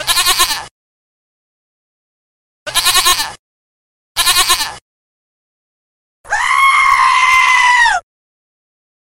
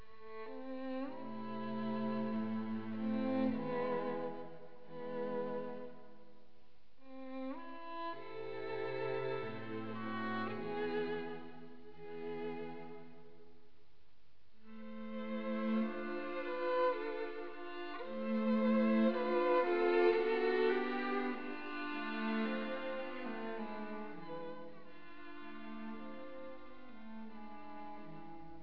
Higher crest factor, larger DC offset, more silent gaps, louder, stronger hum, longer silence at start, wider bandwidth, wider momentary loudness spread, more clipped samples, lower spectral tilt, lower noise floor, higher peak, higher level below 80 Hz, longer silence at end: about the same, 16 dB vs 20 dB; second, under 0.1% vs 0.4%; first, 0.71-2.66 s, 3.39-4.15 s, 4.81-6.24 s vs none; first, -10 LUFS vs -39 LUFS; neither; about the same, 0 s vs 0 s; first, 16.5 kHz vs 5.4 kHz; second, 13 LU vs 20 LU; neither; second, 2 dB/octave vs -4.5 dB/octave; first, under -90 dBFS vs -73 dBFS; first, 0 dBFS vs -20 dBFS; first, -42 dBFS vs -78 dBFS; first, 1.15 s vs 0 s